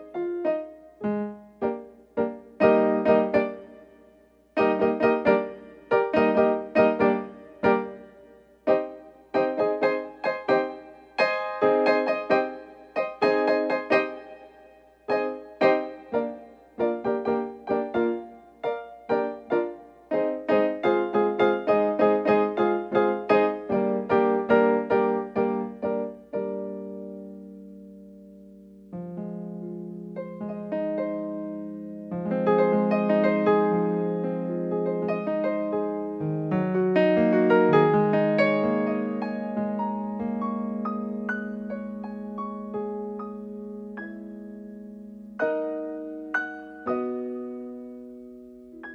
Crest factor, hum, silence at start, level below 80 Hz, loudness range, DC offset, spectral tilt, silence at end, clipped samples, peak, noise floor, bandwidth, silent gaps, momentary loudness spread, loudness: 22 dB; 60 Hz at -65 dBFS; 0 s; -64 dBFS; 11 LU; under 0.1%; -8.5 dB/octave; 0 s; under 0.1%; -4 dBFS; -57 dBFS; 6.4 kHz; none; 17 LU; -25 LUFS